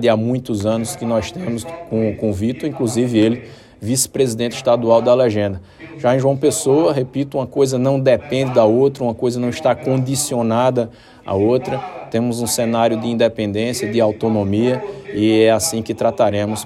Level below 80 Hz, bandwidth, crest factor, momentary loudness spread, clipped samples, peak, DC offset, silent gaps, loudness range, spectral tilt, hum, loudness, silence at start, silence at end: -54 dBFS; 15.5 kHz; 16 dB; 10 LU; under 0.1%; 0 dBFS; under 0.1%; none; 3 LU; -5.5 dB/octave; none; -17 LUFS; 0 s; 0 s